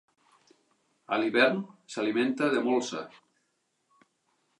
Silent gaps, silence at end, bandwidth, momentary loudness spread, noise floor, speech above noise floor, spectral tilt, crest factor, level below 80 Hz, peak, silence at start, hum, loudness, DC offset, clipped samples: none; 1.5 s; 11 kHz; 15 LU; -76 dBFS; 49 dB; -4.5 dB/octave; 22 dB; -86 dBFS; -8 dBFS; 1.1 s; none; -28 LUFS; under 0.1%; under 0.1%